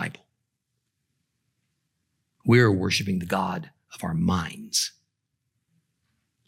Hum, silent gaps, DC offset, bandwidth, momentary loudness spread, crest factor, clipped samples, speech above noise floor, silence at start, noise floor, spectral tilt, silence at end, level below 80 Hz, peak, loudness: none; none; under 0.1%; 16.5 kHz; 16 LU; 22 dB; under 0.1%; 56 dB; 0 s; -79 dBFS; -5 dB/octave; 1.6 s; -62 dBFS; -6 dBFS; -24 LUFS